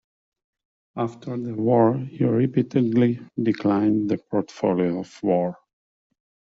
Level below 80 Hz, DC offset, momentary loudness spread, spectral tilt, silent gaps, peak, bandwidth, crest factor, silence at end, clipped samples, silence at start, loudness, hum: -64 dBFS; under 0.1%; 10 LU; -8.5 dB/octave; none; -6 dBFS; 7.6 kHz; 18 dB; 0.95 s; under 0.1%; 0.95 s; -23 LUFS; none